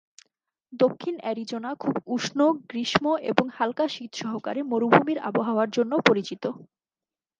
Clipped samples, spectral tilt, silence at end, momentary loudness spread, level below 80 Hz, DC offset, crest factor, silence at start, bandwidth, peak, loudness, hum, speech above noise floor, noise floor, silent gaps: under 0.1%; -5 dB/octave; 0.75 s; 12 LU; -66 dBFS; under 0.1%; 26 dB; 0.7 s; 9.4 kHz; 0 dBFS; -25 LUFS; none; over 65 dB; under -90 dBFS; none